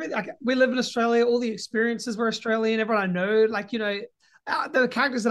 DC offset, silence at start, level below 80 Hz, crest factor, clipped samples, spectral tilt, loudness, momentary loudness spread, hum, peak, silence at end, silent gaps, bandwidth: under 0.1%; 0 s; -72 dBFS; 16 dB; under 0.1%; -4.5 dB/octave; -24 LUFS; 7 LU; none; -8 dBFS; 0 s; none; 12 kHz